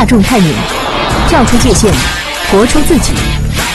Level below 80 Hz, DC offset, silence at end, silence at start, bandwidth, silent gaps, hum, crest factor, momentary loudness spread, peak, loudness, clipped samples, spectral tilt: -18 dBFS; under 0.1%; 0 s; 0 s; 13.5 kHz; none; none; 8 dB; 6 LU; 0 dBFS; -10 LUFS; under 0.1%; -4.5 dB/octave